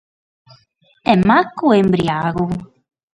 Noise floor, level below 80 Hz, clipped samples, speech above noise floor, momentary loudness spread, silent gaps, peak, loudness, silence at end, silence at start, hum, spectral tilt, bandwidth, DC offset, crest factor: -57 dBFS; -46 dBFS; under 0.1%; 42 dB; 10 LU; none; 0 dBFS; -16 LUFS; 0.5 s; 1.05 s; none; -7.5 dB/octave; 9.8 kHz; under 0.1%; 18 dB